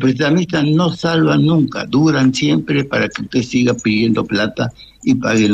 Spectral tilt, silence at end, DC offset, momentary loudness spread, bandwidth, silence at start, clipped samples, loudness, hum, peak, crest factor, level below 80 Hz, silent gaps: -6 dB/octave; 0 s; under 0.1%; 5 LU; 8.6 kHz; 0 s; under 0.1%; -15 LUFS; none; -4 dBFS; 10 dB; -48 dBFS; none